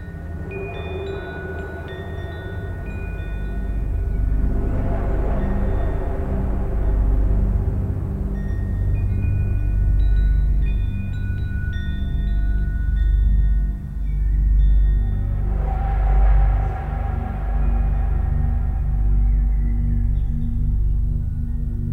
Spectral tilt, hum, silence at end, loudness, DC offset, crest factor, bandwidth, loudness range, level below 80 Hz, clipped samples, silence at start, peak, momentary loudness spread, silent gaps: -9.5 dB/octave; 50 Hz at -25 dBFS; 0 s; -23 LUFS; under 0.1%; 12 dB; 4.1 kHz; 5 LU; -20 dBFS; under 0.1%; 0 s; -8 dBFS; 10 LU; none